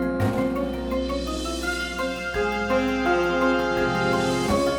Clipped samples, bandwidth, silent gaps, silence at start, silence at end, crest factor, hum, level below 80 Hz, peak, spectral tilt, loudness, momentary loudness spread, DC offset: under 0.1%; 19 kHz; none; 0 s; 0 s; 14 dB; none; -38 dBFS; -8 dBFS; -5 dB/octave; -24 LUFS; 6 LU; under 0.1%